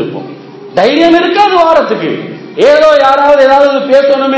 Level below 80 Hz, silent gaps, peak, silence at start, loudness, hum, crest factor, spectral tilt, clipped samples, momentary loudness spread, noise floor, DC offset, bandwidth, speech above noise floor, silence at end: -46 dBFS; none; 0 dBFS; 0 s; -7 LUFS; none; 8 dB; -5 dB/octave; 5%; 14 LU; -27 dBFS; under 0.1%; 8 kHz; 20 dB; 0 s